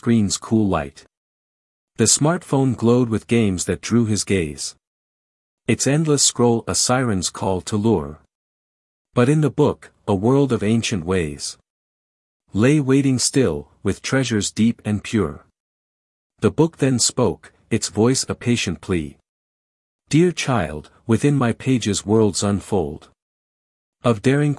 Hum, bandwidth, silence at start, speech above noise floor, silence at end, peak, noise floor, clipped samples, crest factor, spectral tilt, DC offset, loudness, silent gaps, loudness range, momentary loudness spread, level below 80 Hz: none; 12 kHz; 0.05 s; over 71 dB; 0 s; -2 dBFS; under -90 dBFS; under 0.1%; 18 dB; -5 dB/octave; under 0.1%; -19 LUFS; 1.17-1.88 s, 4.87-5.58 s, 8.35-9.05 s, 11.70-12.40 s, 15.60-16.30 s, 19.29-19.99 s, 23.22-23.93 s; 3 LU; 9 LU; -50 dBFS